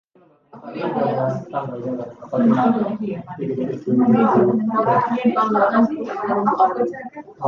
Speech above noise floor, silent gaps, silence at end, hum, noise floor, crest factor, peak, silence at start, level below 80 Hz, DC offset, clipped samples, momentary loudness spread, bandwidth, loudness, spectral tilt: 33 dB; none; 0 s; none; -52 dBFS; 16 dB; -4 dBFS; 0.55 s; -62 dBFS; under 0.1%; under 0.1%; 12 LU; 6.4 kHz; -19 LUFS; -9 dB/octave